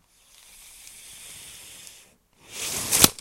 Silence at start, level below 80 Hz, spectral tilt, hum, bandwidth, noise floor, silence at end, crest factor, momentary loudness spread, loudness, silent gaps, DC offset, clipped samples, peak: 0.95 s; -52 dBFS; -1 dB/octave; none; 16.5 kHz; -56 dBFS; 0.05 s; 28 dB; 27 LU; -21 LUFS; none; under 0.1%; under 0.1%; 0 dBFS